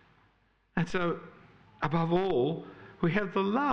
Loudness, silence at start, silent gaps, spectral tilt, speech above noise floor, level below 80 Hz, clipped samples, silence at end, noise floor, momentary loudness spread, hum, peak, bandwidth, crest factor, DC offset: -31 LUFS; 0 s; none; -7.5 dB/octave; 40 dB; -56 dBFS; under 0.1%; 0 s; -68 dBFS; 11 LU; none; -14 dBFS; 8 kHz; 18 dB; under 0.1%